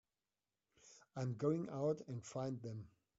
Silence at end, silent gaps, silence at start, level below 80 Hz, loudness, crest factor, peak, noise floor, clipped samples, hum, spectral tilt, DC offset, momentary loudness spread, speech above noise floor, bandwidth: 0.3 s; none; 0.85 s; -80 dBFS; -43 LUFS; 20 dB; -26 dBFS; under -90 dBFS; under 0.1%; none; -8.5 dB/octave; under 0.1%; 14 LU; over 48 dB; 8 kHz